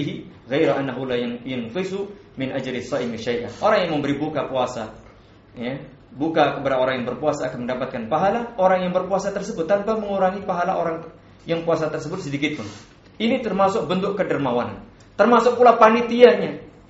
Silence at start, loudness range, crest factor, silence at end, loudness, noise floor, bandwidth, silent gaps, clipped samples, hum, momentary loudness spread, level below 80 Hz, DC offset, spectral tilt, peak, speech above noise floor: 0 s; 6 LU; 22 dB; 0.2 s; -21 LUFS; -48 dBFS; 8 kHz; none; under 0.1%; none; 16 LU; -54 dBFS; under 0.1%; -4.5 dB/octave; 0 dBFS; 27 dB